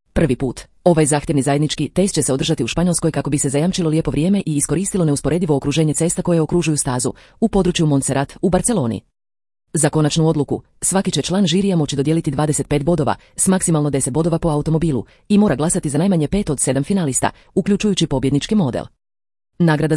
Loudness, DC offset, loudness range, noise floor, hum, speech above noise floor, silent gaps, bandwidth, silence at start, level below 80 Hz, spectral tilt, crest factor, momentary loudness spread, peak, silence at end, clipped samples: -18 LUFS; under 0.1%; 1 LU; under -90 dBFS; none; over 73 dB; none; 12 kHz; 0.15 s; -38 dBFS; -5 dB/octave; 18 dB; 4 LU; 0 dBFS; 0 s; under 0.1%